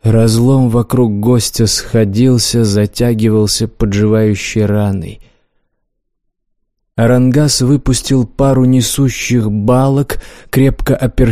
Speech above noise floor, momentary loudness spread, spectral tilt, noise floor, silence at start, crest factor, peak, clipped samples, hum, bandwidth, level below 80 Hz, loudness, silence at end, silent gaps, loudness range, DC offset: 56 dB; 5 LU; -5.5 dB/octave; -67 dBFS; 0.05 s; 10 dB; 0 dBFS; under 0.1%; none; 15.5 kHz; -28 dBFS; -12 LUFS; 0 s; none; 5 LU; 0.8%